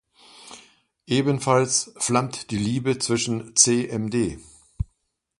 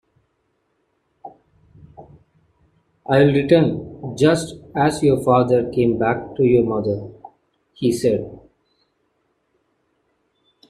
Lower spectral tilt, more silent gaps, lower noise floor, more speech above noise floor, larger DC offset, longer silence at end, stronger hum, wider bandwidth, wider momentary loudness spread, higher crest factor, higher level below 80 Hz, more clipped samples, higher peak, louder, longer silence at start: second, -4 dB/octave vs -7 dB/octave; neither; about the same, -71 dBFS vs -69 dBFS; about the same, 49 dB vs 51 dB; neither; second, 0.55 s vs 2.35 s; neither; second, 11.5 kHz vs 14 kHz; first, 17 LU vs 13 LU; first, 24 dB vs 18 dB; first, -46 dBFS vs -52 dBFS; neither; about the same, 0 dBFS vs -2 dBFS; second, -22 LUFS vs -18 LUFS; second, 0.4 s vs 1.25 s